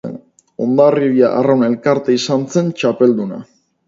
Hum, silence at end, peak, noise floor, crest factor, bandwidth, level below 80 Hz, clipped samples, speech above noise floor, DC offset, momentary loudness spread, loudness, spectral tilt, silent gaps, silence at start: none; 0.45 s; 0 dBFS; -34 dBFS; 14 dB; 7.8 kHz; -62 dBFS; under 0.1%; 21 dB; under 0.1%; 13 LU; -14 LUFS; -6.5 dB/octave; none; 0.05 s